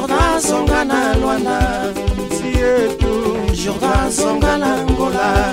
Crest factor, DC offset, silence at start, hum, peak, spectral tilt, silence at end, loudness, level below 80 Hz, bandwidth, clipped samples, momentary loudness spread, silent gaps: 14 dB; under 0.1%; 0 s; none; -2 dBFS; -5 dB/octave; 0 s; -16 LUFS; -24 dBFS; 16 kHz; under 0.1%; 4 LU; none